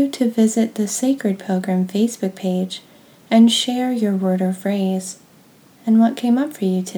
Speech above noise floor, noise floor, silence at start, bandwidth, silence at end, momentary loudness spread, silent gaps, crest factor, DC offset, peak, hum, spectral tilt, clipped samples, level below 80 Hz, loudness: 32 dB; -50 dBFS; 0 s; over 20 kHz; 0 s; 10 LU; none; 16 dB; under 0.1%; -4 dBFS; none; -5.5 dB/octave; under 0.1%; -76 dBFS; -19 LUFS